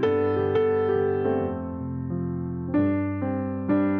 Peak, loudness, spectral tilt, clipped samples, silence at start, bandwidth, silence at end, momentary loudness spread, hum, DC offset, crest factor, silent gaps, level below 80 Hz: -12 dBFS; -26 LUFS; -8 dB/octave; under 0.1%; 0 s; 4.8 kHz; 0 s; 8 LU; none; under 0.1%; 12 dB; none; -52 dBFS